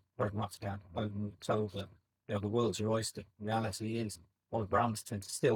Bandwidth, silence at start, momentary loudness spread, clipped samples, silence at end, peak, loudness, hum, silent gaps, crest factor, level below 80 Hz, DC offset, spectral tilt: 18.5 kHz; 0.2 s; 10 LU; under 0.1%; 0 s; -16 dBFS; -37 LUFS; none; none; 20 dB; -70 dBFS; under 0.1%; -5.5 dB/octave